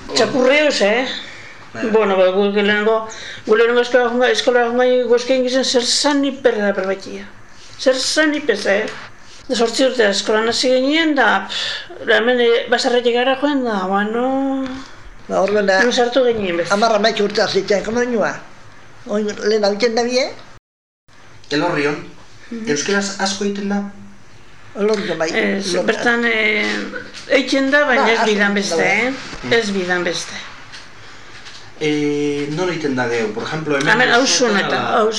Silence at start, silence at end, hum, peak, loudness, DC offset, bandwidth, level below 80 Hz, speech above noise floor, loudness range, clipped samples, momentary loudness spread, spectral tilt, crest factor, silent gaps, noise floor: 0 s; 0 s; none; -2 dBFS; -16 LUFS; 1%; 12 kHz; -52 dBFS; 28 dB; 6 LU; under 0.1%; 12 LU; -3.5 dB/octave; 16 dB; 20.59-21.07 s; -44 dBFS